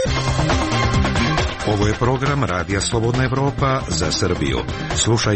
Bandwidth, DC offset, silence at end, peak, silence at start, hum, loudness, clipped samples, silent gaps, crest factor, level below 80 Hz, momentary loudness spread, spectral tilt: 8.8 kHz; under 0.1%; 0 s; -6 dBFS; 0 s; none; -19 LUFS; under 0.1%; none; 12 dB; -30 dBFS; 3 LU; -4.5 dB/octave